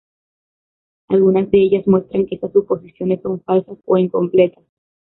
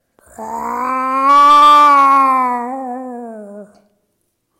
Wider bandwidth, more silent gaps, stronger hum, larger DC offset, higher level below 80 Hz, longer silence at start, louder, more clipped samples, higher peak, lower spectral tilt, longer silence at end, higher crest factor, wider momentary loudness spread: second, 4.1 kHz vs 15.5 kHz; neither; neither; neither; about the same, -54 dBFS vs -58 dBFS; first, 1.1 s vs 0.4 s; second, -17 LUFS vs -10 LUFS; neither; about the same, -2 dBFS vs -2 dBFS; first, -12.5 dB/octave vs -2.5 dB/octave; second, 0.55 s vs 0.95 s; about the same, 14 dB vs 10 dB; second, 7 LU vs 23 LU